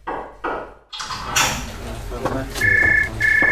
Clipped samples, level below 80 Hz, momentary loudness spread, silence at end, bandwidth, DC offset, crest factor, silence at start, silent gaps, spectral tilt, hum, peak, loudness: under 0.1%; -36 dBFS; 17 LU; 0 s; 16 kHz; 0.6%; 16 dB; 0.05 s; none; -2.5 dB/octave; none; -4 dBFS; -19 LUFS